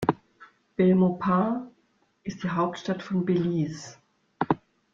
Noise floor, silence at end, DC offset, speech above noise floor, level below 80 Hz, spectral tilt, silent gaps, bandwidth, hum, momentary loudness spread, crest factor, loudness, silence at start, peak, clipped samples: -68 dBFS; 0.4 s; under 0.1%; 43 dB; -62 dBFS; -7.5 dB/octave; none; 7.6 kHz; none; 17 LU; 22 dB; -26 LUFS; 0 s; -6 dBFS; under 0.1%